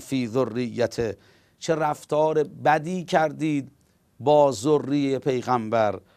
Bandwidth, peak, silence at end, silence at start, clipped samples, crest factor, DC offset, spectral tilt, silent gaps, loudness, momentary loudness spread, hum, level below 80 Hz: 14.5 kHz; -6 dBFS; 0.2 s; 0 s; under 0.1%; 18 dB; under 0.1%; -6 dB/octave; none; -24 LUFS; 8 LU; none; -60 dBFS